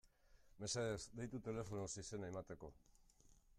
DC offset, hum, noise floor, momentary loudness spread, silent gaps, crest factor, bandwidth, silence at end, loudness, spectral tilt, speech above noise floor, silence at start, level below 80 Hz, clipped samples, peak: under 0.1%; none; -70 dBFS; 11 LU; none; 18 dB; 14.5 kHz; 0 s; -48 LUFS; -4.5 dB/octave; 22 dB; 0.05 s; -68 dBFS; under 0.1%; -32 dBFS